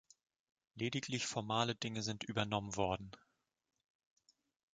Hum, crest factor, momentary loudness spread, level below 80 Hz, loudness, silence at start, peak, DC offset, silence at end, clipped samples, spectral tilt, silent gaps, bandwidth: none; 24 dB; 6 LU; -66 dBFS; -39 LUFS; 0.75 s; -18 dBFS; under 0.1%; 1.6 s; under 0.1%; -4 dB/octave; none; 9.4 kHz